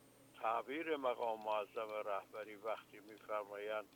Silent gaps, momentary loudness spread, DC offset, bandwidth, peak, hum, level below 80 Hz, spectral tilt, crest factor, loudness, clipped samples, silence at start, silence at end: none; 10 LU; under 0.1%; 19 kHz; -24 dBFS; none; -88 dBFS; -4 dB/octave; 18 dB; -43 LUFS; under 0.1%; 0.05 s; 0 s